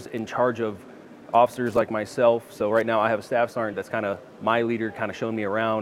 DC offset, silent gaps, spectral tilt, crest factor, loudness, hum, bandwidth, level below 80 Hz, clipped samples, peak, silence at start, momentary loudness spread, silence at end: under 0.1%; none; -6 dB/octave; 18 dB; -25 LUFS; none; 14.5 kHz; -66 dBFS; under 0.1%; -6 dBFS; 0 s; 8 LU; 0 s